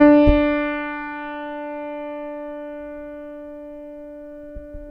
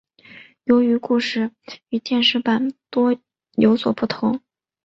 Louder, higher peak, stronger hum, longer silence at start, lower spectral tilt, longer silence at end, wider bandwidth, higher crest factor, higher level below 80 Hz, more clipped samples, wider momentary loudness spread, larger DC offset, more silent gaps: about the same, -22 LUFS vs -20 LUFS; about the same, -2 dBFS vs -4 dBFS; neither; second, 0 s vs 0.35 s; first, -9.5 dB/octave vs -5.5 dB/octave; second, 0 s vs 0.5 s; second, 5.2 kHz vs 7.6 kHz; about the same, 20 dB vs 18 dB; first, -34 dBFS vs -62 dBFS; neither; first, 21 LU vs 11 LU; neither; neither